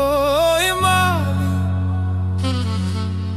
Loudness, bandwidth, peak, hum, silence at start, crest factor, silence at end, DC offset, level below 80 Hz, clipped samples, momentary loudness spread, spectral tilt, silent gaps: -19 LUFS; 15 kHz; -4 dBFS; none; 0 s; 14 dB; 0 s; under 0.1%; -38 dBFS; under 0.1%; 6 LU; -5 dB/octave; none